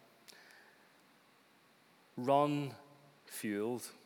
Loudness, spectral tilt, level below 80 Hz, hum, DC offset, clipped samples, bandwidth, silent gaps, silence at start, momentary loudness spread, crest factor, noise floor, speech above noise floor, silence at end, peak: -36 LUFS; -5.5 dB/octave; under -90 dBFS; none; under 0.1%; under 0.1%; over 20 kHz; none; 2.15 s; 27 LU; 24 dB; -67 dBFS; 32 dB; 0.15 s; -16 dBFS